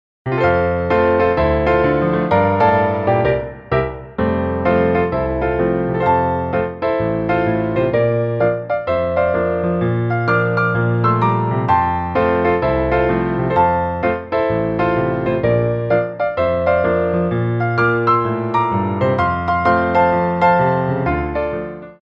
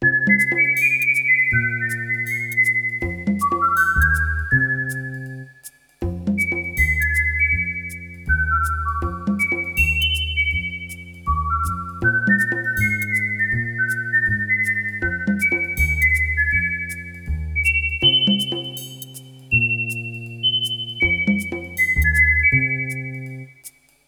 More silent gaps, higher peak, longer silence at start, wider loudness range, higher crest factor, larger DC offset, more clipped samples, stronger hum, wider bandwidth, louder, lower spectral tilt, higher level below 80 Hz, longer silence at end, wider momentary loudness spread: neither; about the same, -2 dBFS vs -4 dBFS; first, 0.25 s vs 0 s; about the same, 2 LU vs 3 LU; about the same, 14 dB vs 16 dB; neither; neither; neither; second, 5.8 kHz vs over 20 kHz; about the same, -17 LUFS vs -19 LUFS; first, -9.5 dB/octave vs -4 dB/octave; about the same, -36 dBFS vs -32 dBFS; second, 0.1 s vs 0.4 s; second, 5 LU vs 14 LU